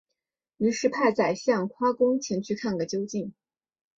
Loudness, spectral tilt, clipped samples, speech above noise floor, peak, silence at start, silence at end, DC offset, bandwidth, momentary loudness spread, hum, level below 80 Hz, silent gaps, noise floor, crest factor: -26 LUFS; -5 dB/octave; under 0.1%; 59 dB; -8 dBFS; 0.6 s; 0.7 s; under 0.1%; 7.8 kHz; 7 LU; none; -68 dBFS; none; -85 dBFS; 18 dB